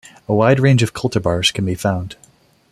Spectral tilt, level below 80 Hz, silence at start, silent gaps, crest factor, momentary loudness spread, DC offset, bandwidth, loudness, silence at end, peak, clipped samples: -5.5 dB/octave; -46 dBFS; 0.3 s; none; 16 dB; 8 LU; under 0.1%; 14 kHz; -17 LUFS; 0.6 s; -2 dBFS; under 0.1%